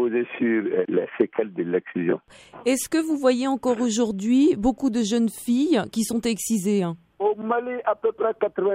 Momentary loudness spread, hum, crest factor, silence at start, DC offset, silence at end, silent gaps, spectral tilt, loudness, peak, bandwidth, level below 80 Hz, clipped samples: 5 LU; none; 18 dB; 0 s; under 0.1%; 0 s; none; -5 dB/octave; -23 LUFS; -6 dBFS; 16 kHz; -54 dBFS; under 0.1%